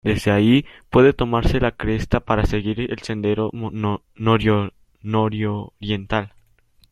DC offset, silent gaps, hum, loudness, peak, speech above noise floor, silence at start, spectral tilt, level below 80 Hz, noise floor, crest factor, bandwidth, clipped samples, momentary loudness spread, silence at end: under 0.1%; none; none; -20 LUFS; -2 dBFS; 37 dB; 0.05 s; -7.5 dB/octave; -34 dBFS; -57 dBFS; 18 dB; 13 kHz; under 0.1%; 10 LU; 0.65 s